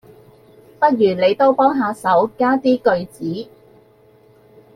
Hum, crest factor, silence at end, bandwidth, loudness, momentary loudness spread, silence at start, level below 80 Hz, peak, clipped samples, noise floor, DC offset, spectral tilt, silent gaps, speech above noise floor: none; 16 dB; 1.3 s; 13.5 kHz; -17 LUFS; 12 LU; 0.8 s; -60 dBFS; -2 dBFS; under 0.1%; -51 dBFS; under 0.1%; -6.5 dB/octave; none; 35 dB